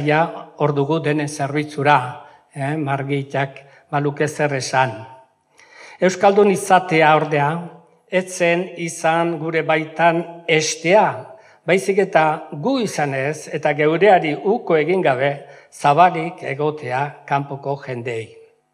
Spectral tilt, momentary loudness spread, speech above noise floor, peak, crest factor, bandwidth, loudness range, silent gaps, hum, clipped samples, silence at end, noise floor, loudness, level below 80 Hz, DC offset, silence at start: -5 dB/octave; 12 LU; 34 dB; 0 dBFS; 18 dB; 14.5 kHz; 4 LU; none; none; under 0.1%; 0.45 s; -52 dBFS; -18 LUFS; -72 dBFS; under 0.1%; 0 s